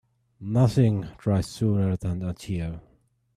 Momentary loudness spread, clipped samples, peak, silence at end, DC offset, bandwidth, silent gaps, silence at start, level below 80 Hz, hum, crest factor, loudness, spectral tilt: 12 LU; under 0.1%; -8 dBFS; 0.55 s; under 0.1%; 13.5 kHz; none; 0.4 s; -48 dBFS; none; 18 dB; -26 LUFS; -8 dB/octave